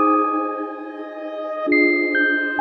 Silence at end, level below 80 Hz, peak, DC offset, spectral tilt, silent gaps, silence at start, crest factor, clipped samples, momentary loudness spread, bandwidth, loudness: 0 s; -68 dBFS; -6 dBFS; under 0.1%; -6 dB/octave; none; 0 s; 14 dB; under 0.1%; 15 LU; 4.5 kHz; -19 LUFS